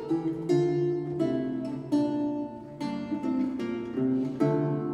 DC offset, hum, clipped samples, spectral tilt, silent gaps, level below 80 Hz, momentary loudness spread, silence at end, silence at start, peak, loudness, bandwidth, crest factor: under 0.1%; none; under 0.1%; -8.5 dB/octave; none; -64 dBFS; 8 LU; 0 s; 0 s; -12 dBFS; -29 LUFS; 10.5 kHz; 16 dB